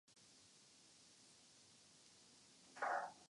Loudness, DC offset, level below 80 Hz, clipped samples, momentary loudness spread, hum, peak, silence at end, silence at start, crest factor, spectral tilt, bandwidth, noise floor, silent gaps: -46 LUFS; under 0.1%; under -90 dBFS; under 0.1%; 21 LU; none; -32 dBFS; 0.05 s; 0.15 s; 22 dB; -1.5 dB/octave; 11.5 kHz; -68 dBFS; none